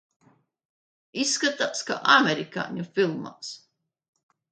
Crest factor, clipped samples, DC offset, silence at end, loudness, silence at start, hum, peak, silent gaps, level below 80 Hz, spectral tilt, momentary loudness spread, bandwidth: 24 dB; under 0.1%; under 0.1%; 0.95 s; -24 LUFS; 1.15 s; none; -4 dBFS; none; -76 dBFS; -2.5 dB/octave; 19 LU; 9.4 kHz